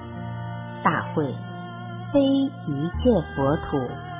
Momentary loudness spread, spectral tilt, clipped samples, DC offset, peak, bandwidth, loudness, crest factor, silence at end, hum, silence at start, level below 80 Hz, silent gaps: 13 LU; -11.5 dB/octave; under 0.1%; under 0.1%; -6 dBFS; 3.8 kHz; -25 LUFS; 20 dB; 0 s; none; 0 s; -40 dBFS; none